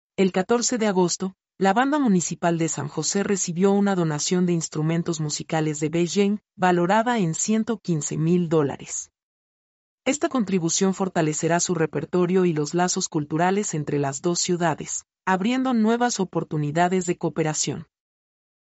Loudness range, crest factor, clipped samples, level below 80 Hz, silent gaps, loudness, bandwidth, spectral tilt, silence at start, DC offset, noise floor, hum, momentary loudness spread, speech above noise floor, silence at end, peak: 2 LU; 16 dB; under 0.1%; -64 dBFS; 9.23-9.98 s; -23 LUFS; 8.2 kHz; -5 dB/octave; 0.2 s; under 0.1%; under -90 dBFS; none; 6 LU; over 68 dB; 0.9 s; -8 dBFS